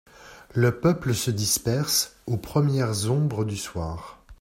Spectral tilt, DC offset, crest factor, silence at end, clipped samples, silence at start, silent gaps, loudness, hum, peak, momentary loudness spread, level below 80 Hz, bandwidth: -4.5 dB/octave; under 0.1%; 16 dB; 0.05 s; under 0.1%; 0.2 s; none; -25 LUFS; none; -8 dBFS; 10 LU; -50 dBFS; 16.5 kHz